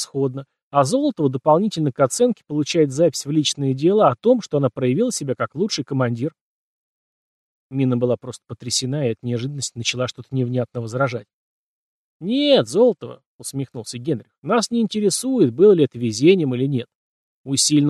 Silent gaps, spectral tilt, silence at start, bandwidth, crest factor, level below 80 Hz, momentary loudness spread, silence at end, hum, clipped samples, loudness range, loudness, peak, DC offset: 0.62-0.71 s, 6.41-7.70 s, 11.33-12.20 s, 13.26-13.39 s, 14.38-14.42 s, 16.95-17.44 s; -5 dB/octave; 0 s; 13 kHz; 18 dB; -66 dBFS; 13 LU; 0 s; none; under 0.1%; 6 LU; -20 LUFS; -2 dBFS; under 0.1%